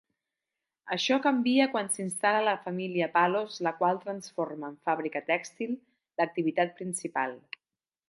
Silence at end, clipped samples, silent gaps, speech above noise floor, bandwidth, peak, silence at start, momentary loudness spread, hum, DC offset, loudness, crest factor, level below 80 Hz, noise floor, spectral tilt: 0.7 s; under 0.1%; none; over 61 dB; 11.5 kHz; -10 dBFS; 0.85 s; 10 LU; none; under 0.1%; -29 LUFS; 20 dB; -84 dBFS; under -90 dBFS; -4 dB/octave